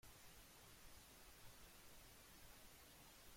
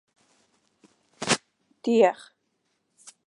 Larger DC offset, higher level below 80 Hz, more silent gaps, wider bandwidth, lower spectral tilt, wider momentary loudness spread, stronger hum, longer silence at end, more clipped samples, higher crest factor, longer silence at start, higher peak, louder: neither; about the same, -72 dBFS vs -76 dBFS; neither; first, 16.5 kHz vs 11.5 kHz; about the same, -2.5 dB/octave vs -3.5 dB/octave; second, 0 LU vs 14 LU; neither; second, 0 s vs 1.15 s; neither; second, 14 dB vs 24 dB; second, 0.05 s vs 1.2 s; second, -50 dBFS vs -6 dBFS; second, -63 LUFS vs -24 LUFS